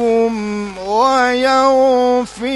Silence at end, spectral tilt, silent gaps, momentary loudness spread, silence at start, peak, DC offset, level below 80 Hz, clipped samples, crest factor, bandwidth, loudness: 0 s; -4 dB/octave; none; 9 LU; 0 s; -2 dBFS; under 0.1%; -48 dBFS; under 0.1%; 12 dB; 11.5 kHz; -14 LUFS